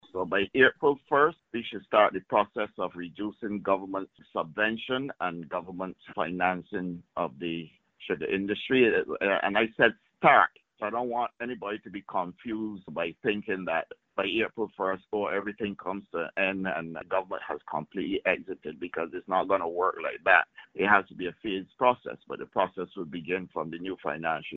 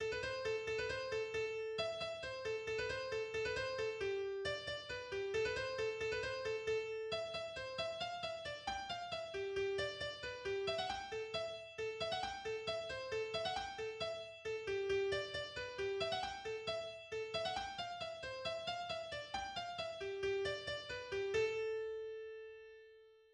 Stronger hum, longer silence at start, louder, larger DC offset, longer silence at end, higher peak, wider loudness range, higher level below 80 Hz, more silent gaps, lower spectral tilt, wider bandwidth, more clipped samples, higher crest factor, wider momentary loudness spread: neither; first, 0.15 s vs 0 s; first, -29 LUFS vs -42 LUFS; neither; about the same, 0 s vs 0.1 s; first, -6 dBFS vs -26 dBFS; first, 7 LU vs 2 LU; about the same, -66 dBFS vs -66 dBFS; neither; about the same, -2.5 dB/octave vs -3.5 dB/octave; second, 4.3 kHz vs 10.5 kHz; neither; first, 24 dB vs 16 dB; first, 13 LU vs 6 LU